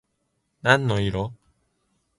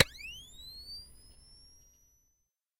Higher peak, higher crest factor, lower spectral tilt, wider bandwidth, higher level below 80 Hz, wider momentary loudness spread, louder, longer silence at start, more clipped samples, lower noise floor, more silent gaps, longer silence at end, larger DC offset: first, -2 dBFS vs -8 dBFS; second, 24 dB vs 30 dB; first, -5.5 dB/octave vs -2.5 dB/octave; second, 11.5 kHz vs 16 kHz; first, -48 dBFS vs -58 dBFS; second, 11 LU vs 16 LU; first, -22 LUFS vs -38 LUFS; first, 0.65 s vs 0 s; neither; second, -74 dBFS vs -80 dBFS; neither; second, 0.85 s vs 1.25 s; neither